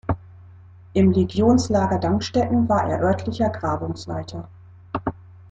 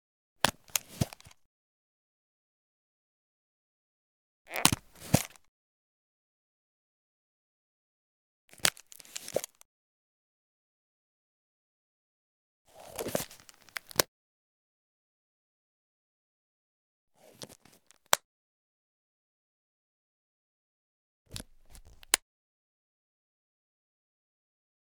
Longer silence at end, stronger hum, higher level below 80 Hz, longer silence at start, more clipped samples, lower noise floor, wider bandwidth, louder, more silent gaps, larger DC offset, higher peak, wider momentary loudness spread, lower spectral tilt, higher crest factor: second, 0.2 s vs 2.7 s; neither; first, -46 dBFS vs -62 dBFS; second, 0.05 s vs 0.45 s; neither; second, -45 dBFS vs -63 dBFS; second, 8.8 kHz vs 19.5 kHz; first, -22 LUFS vs -31 LUFS; second, none vs 1.45-4.45 s, 5.48-8.48 s, 9.65-12.65 s, 14.08-17.08 s, 18.25-21.25 s; neither; second, -6 dBFS vs 0 dBFS; second, 13 LU vs 20 LU; first, -7 dB/octave vs -2.5 dB/octave; second, 16 dB vs 40 dB